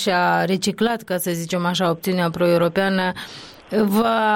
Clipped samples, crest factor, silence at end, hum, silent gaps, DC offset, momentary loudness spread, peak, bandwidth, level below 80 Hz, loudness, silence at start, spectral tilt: under 0.1%; 12 dB; 0 s; none; none; under 0.1%; 7 LU; -8 dBFS; 17 kHz; -56 dBFS; -20 LUFS; 0 s; -5 dB/octave